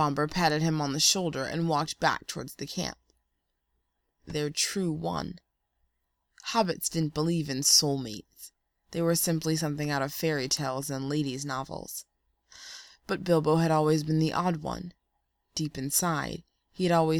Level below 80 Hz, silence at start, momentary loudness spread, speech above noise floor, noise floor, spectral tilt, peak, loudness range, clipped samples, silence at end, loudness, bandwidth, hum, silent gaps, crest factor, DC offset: -58 dBFS; 0 s; 16 LU; 51 dB; -79 dBFS; -4 dB/octave; -8 dBFS; 7 LU; under 0.1%; 0 s; -28 LUFS; 19.5 kHz; none; none; 22 dB; under 0.1%